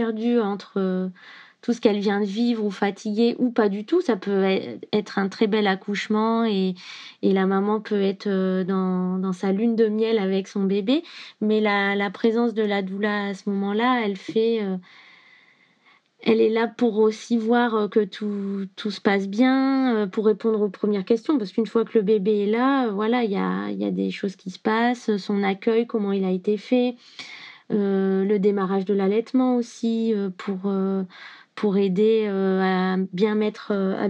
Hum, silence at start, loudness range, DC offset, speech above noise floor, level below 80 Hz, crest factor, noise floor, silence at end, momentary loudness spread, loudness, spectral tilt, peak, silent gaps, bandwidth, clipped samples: none; 0 s; 2 LU; under 0.1%; 37 dB; under -90 dBFS; 18 dB; -59 dBFS; 0 s; 7 LU; -23 LUFS; -7 dB/octave; -4 dBFS; none; 8.4 kHz; under 0.1%